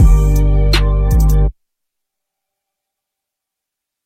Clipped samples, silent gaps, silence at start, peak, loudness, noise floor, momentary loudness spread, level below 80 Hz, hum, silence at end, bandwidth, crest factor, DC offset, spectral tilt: under 0.1%; none; 0 s; 0 dBFS; -14 LUFS; -81 dBFS; 3 LU; -14 dBFS; none; 2.55 s; 15 kHz; 14 dB; under 0.1%; -6 dB/octave